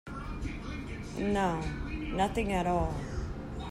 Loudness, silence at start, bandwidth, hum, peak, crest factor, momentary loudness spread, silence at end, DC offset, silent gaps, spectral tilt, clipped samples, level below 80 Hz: -34 LUFS; 0.05 s; 14 kHz; none; -16 dBFS; 16 dB; 10 LU; 0 s; under 0.1%; none; -6.5 dB/octave; under 0.1%; -40 dBFS